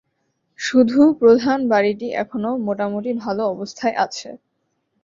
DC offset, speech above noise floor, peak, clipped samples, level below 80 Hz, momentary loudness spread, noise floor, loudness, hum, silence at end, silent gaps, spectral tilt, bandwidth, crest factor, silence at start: under 0.1%; 53 dB; -2 dBFS; under 0.1%; -62 dBFS; 11 LU; -71 dBFS; -19 LUFS; none; 0.65 s; none; -5.5 dB/octave; 7.6 kHz; 16 dB; 0.6 s